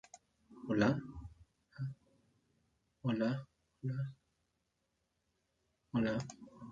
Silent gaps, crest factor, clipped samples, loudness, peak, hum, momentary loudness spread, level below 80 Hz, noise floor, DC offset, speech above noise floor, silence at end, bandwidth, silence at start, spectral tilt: none; 24 dB; under 0.1%; -38 LUFS; -18 dBFS; none; 20 LU; -66 dBFS; -83 dBFS; under 0.1%; 48 dB; 0 s; 7.8 kHz; 0.15 s; -7 dB/octave